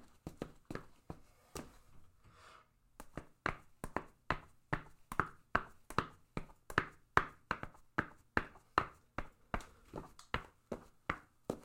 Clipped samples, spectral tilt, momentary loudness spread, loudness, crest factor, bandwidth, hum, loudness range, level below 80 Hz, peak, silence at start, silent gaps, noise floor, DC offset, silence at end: under 0.1%; -5 dB/octave; 16 LU; -42 LUFS; 34 dB; 16.5 kHz; none; 10 LU; -58 dBFS; -10 dBFS; 0 s; none; -65 dBFS; under 0.1%; 0 s